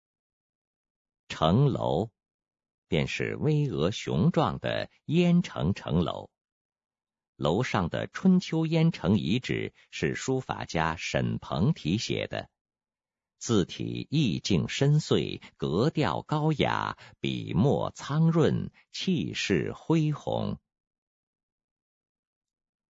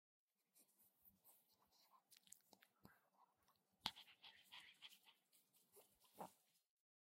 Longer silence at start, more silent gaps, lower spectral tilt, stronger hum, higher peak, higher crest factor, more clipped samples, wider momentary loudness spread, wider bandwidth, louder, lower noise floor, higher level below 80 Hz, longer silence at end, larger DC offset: first, 1.3 s vs 0.55 s; first, 2.34-2.39 s, 2.74-2.83 s, 6.41-6.45 s, 6.52-6.70 s, 7.28-7.33 s, 12.61-12.65 s vs none; first, -6.5 dB/octave vs -1.5 dB/octave; neither; first, -8 dBFS vs -22 dBFS; second, 22 dB vs 44 dB; neither; second, 9 LU vs 15 LU; second, 8 kHz vs 16 kHz; first, -28 LUFS vs -59 LUFS; first, under -90 dBFS vs -84 dBFS; first, -56 dBFS vs under -90 dBFS; first, 2.35 s vs 0.4 s; neither